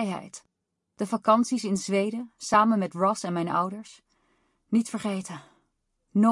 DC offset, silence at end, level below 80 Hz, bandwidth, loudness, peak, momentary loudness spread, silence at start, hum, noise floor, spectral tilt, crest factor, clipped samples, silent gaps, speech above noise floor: under 0.1%; 0 s; -72 dBFS; 11.5 kHz; -26 LUFS; -8 dBFS; 16 LU; 0 s; none; -77 dBFS; -5.5 dB/octave; 20 dB; under 0.1%; none; 51 dB